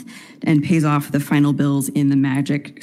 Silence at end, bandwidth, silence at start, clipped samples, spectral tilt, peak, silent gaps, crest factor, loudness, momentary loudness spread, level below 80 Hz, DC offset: 0 s; 15 kHz; 0 s; under 0.1%; -6.5 dB/octave; -4 dBFS; none; 14 dB; -18 LUFS; 6 LU; -62 dBFS; under 0.1%